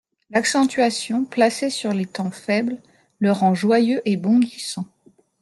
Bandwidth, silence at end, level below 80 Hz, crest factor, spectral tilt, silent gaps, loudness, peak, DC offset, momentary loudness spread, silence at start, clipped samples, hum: 12.5 kHz; 0.55 s; -68 dBFS; 16 dB; -5 dB/octave; none; -20 LUFS; -4 dBFS; under 0.1%; 10 LU; 0.3 s; under 0.1%; none